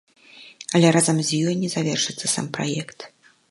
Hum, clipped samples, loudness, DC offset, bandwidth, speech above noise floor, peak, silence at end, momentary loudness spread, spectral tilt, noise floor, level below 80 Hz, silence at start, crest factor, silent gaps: none; under 0.1%; -21 LUFS; under 0.1%; 11.5 kHz; 23 dB; -2 dBFS; 0.45 s; 20 LU; -4 dB/octave; -45 dBFS; -68 dBFS; 0.35 s; 20 dB; none